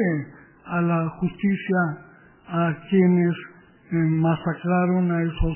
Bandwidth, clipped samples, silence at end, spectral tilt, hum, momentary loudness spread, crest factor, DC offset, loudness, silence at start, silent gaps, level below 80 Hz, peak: 3.2 kHz; under 0.1%; 0 s; -12 dB/octave; none; 10 LU; 14 dB; under 0.1%; -23 LUFS; 0 s; none; -38 dBFS; -8 dBFS